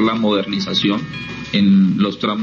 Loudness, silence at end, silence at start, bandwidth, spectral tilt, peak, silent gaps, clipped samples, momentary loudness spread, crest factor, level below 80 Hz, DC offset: -16 LUFS; 0 s; 0 s; 7 kHz; -6.5 dB/octave; -6 dBFS; none; under 0.1%; 10 LU; 10 dB; -50 dBFS; under 0.1%